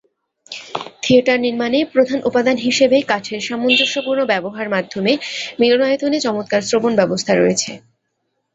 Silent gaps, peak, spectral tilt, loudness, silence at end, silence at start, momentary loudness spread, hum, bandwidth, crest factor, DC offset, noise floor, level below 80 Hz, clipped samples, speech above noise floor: none; -2 dBFS; -3.5 dB/octave; -16 LUFS; 0.75 s; 0.5 s; 10 LU; none; 8.2 kHz; 16 dB; under 0.1%; -71 dBFS; -58 dBFS; under 0.1%; 55 dB